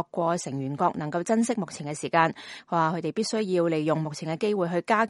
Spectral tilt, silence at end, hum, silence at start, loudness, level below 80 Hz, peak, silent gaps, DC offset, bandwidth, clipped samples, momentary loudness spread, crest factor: -5.5 dB/octave; 0 s; none; 0 s; -27 LUFS; -70 dBFS; -6 dBFS; none; under 0.1%; 11.5 kHz; under 0.1%; 7 LU; 20 dB